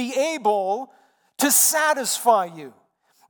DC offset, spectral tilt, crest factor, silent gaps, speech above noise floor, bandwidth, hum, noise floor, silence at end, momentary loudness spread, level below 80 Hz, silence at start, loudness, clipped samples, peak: under 0.1%; -1 dB/octave; 18 dB; none; 41 dB; 19 kHz; none; -62 dBFS; 0.6 s; 14 LU; -88 dBFS; 0 s; -20 LUFS; under 0.1%; -4 dBFS